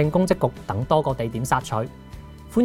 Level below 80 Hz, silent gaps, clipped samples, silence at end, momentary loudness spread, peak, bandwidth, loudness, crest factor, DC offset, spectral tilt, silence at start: -42 dBFS; none; under 0.1%; 0 s; 19 LU; -4 dBFS; 16.5 kHz; -24 LUFS; 18 dB; under 0.1%; -6.5 dB/octave; 0 s